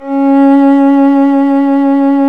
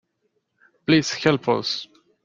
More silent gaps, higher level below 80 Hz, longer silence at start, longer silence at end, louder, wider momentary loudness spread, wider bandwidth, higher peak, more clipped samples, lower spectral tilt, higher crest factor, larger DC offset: neither; second, -66 dBFS vs -60 dBFS; second, 0 s vs 0.9 s; second, 0 s vs 0.4 s; first, -8 LUFS vs -22 LUFS; second, 3 LU vs 12 LU; second, 3.8 kHz vs 7.6 kHz; about the same, 0 dBFS vs -2 dBFS; neither; first, -7 dB/octave vs -5 dB/octave; second, 8 dB vs 22 dB; first, 1% vs under 0.1%